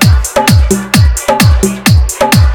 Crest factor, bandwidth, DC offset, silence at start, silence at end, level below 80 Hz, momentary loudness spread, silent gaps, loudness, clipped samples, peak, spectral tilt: 8 dB; over 20 kHz; under 0.1%; 0 s; 0 s; -12 dBFS; 2 LU; none; -9 LUFS; 0.8%; 0 dBFS; -5 dB/octave